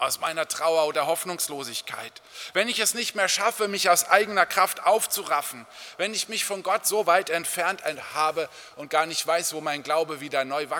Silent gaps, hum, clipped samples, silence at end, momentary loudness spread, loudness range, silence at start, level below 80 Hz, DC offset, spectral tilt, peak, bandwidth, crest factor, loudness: none; none; under 0.1%; 0 s; 11 LU; 3 LU; 0 s; -76 dBFS; under 0.1%; -1 dB/octave; 0 dBFS; 19 kHz; 24 dB; -24 LUFS